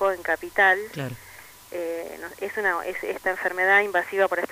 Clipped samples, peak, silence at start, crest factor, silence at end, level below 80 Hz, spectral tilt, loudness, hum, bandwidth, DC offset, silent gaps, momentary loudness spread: under 0.1%; -6 dBFS; 0 s; 18 dB; 0 s; -62 dBFS; -4 dB/octave; -24 LUFS; none; 15.5 kHz; under 0.1%; none; 16 LU